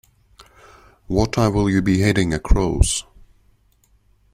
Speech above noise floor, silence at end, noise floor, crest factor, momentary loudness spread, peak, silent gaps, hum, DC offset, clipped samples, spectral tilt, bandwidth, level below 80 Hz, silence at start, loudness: 42 dB; 1.3 s; -59 dBFS; 18 dB; 4 LU; -2 dBFS; none; none; under 0.1%; under 0.1%; -5.5 dB/octave; 15.5 kHz; -26 dBFS; 1.1 s; -19 LUFS